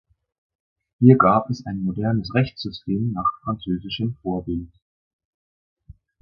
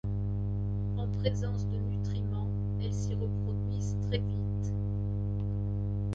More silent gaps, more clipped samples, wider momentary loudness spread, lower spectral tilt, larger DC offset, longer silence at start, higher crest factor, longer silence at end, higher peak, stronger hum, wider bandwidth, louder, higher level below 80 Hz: first, 4.82-5.19 s, 5.25-5.76 s vs none; neither; first, 13 LU vs 2 LU; about the same, -8.5 dB/octave vs -8 dB/octave; neither; first, 1 s vs 0.05 s; first, 22 dB vs 16 dB; first, 0.3 s vs 0 s; first, 0 dBFS vs -16 dBFS; second, none vs 50 Hz at -30 dBFS; second, 6.6 kHz vs 7.6 kHz; first, -22 LUFS vs -33 LUFS; second, -48 dBFS vs -40 dBFS